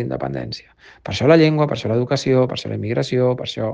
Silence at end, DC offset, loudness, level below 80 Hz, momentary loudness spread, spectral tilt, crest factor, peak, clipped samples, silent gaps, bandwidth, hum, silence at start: 0 s; under 0.1%; -19 LUFS; -52 dBFS; 15 LU; -6.5 dB/octave; 18 dB; 0 dBFS; under 0.1%; none; 9.2 kHz; none; 0 s